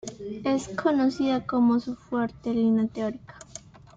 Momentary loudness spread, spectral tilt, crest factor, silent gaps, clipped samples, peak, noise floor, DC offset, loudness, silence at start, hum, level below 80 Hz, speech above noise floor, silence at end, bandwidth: 19 LU; -6 dB/octave; 16 dB; none; under 0.1%; -12 dBFS; -47 dBFS; under 0.1%; -26 LUFS; 0.05 s; none; -58 dBFS; 22 dB; 0.2 s; 7.8 kHz